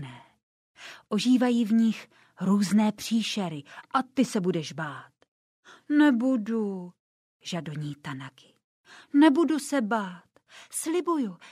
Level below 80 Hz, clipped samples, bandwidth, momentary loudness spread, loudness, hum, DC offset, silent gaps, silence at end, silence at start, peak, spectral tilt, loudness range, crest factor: -76 dBFS; under 0.1%; 15 kHz; 19 LU; -26 LUFS; none; under 0.1%; 0.43-0.75 s, 5.28-5.63 s, 6.99-7.40 s, 8.64-8.84 s; 0 s; 0 s; -8 dBFS; -5.5 dB/octave; 3 LU; 18 dB